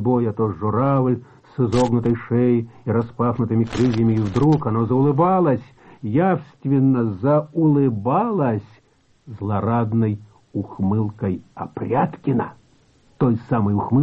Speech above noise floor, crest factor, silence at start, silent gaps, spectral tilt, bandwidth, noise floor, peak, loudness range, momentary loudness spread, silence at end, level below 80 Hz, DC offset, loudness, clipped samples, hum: 39 dB; 12 dB; 0 s; none; -9 dB/octave; 8.4 kHz; -58 dBFS; -8 dBFS; 5 LU; 9 LU; 0 s; -50 dBFS; under 0.1%; -20 LUFS; under 0.1%; none